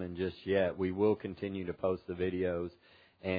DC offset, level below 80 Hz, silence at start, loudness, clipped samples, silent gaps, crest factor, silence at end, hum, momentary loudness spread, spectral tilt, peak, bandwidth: under 0.1%; -64 dBFS; 0 s; -34 LUFS; under 0.1%; none; 18 dB; 0 s; none; 8 LU; -6 dB/octave; -16 dBFS; 5 kHz